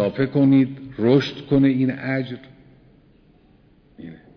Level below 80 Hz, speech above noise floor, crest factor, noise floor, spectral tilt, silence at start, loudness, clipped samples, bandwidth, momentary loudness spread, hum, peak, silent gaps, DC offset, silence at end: -54 dBFS; 35 dB; 18 dB; -54 dBFS; -8.5 dB/octave; 0 s; -20 LUFS; under 0.1%; 5.4 kHz; 23 LU; none; -4 dBFS; none; under 0.1%; 0.2 s